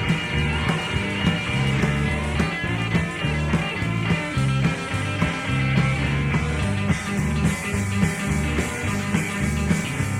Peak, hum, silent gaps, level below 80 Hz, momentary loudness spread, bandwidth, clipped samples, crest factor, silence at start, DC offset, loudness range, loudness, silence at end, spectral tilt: -6 dBFS; none; none; -34 dBFS; 3 LU; 16 kHz; under 0.1%; 16 dB; 0 s; under 0.1%; 1 LU; -23 LUFS; 0 s; -5.5 dB/octave